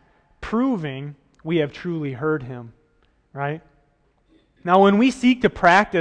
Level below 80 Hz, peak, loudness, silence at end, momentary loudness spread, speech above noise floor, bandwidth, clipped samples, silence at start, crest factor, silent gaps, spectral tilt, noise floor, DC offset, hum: -50 dBFS; -2 dBFS; -20 LUFS; 0 s; 21 LU; 43 dB; 9.8 kHz; under 0.1%; 0.4 s; 18 dB; none; -6.5 dB/octave; -63 dBFS; under 0.1%; none